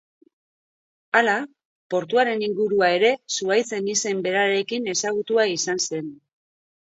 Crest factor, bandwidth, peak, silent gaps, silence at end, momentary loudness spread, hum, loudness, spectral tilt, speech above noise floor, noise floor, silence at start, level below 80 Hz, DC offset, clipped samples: 18 dB; 8 kHz; -4 dBFS; 1.65-1.90 s; 0.8 s; 7 LU; none; -22 LUFS; -2.5 dB/octave; over 68 dB; under -90 dBFS; 1.15 s; -72 dBFS; under 0.1%; under 0.1%